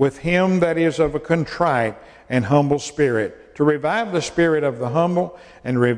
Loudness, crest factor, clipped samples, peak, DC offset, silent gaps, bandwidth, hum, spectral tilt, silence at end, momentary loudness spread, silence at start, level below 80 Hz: -20 LUFS; 16 dB; under 0.1%; -4 dBFS; under 0.1%; none; 10.5 kHz; none; -6.5 dB/octave; 0 s; 6 LU; 0 s; -48 dBFS